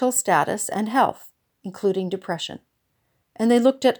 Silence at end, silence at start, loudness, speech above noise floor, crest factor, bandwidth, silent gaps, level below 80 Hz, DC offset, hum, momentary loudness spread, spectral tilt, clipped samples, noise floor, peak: 0.05 s; 0 s; -22 LUFS; 50 dB; 18 dB; over 20 kHz; none; -70 dBFS; under 0.1%; none; 16 LU; -4 dB/octave; under 0.1%; -71 dBFS; -6 dBFS